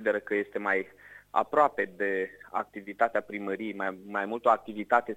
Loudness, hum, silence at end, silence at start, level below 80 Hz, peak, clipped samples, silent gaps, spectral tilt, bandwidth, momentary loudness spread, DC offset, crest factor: -29 LUFS; 50 Hz at -70 dBFS; 0 s; 0 s; -72 dBFS; -8 dBFS; under 0.1%; none; -6 dB/octave; 15.5 kHz; 9 LU; under 0.1%; 22 dB